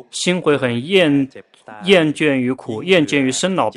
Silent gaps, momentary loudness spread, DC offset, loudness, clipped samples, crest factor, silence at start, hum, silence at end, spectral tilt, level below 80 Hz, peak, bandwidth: none; 8 LU; under 0.1%; -16 LUFS; under 0.1%; 16 dB; 0.15 s; none; 0.05 s; -4.5 dB/octave; -60 dBFS; 0 dBFS; 12 kHz